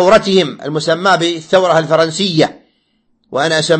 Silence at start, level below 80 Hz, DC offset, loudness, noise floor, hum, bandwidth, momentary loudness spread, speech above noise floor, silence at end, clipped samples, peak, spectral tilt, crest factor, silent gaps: 0 s; -48 dBFS; under 0.1%; -13 LUFS; -60 dBFS; none; 8.8 kHz; 7 LU; 48 dB; 0 s; under 0.1%; 0 dBFS; -4.5 dB/octave; 14 dB; none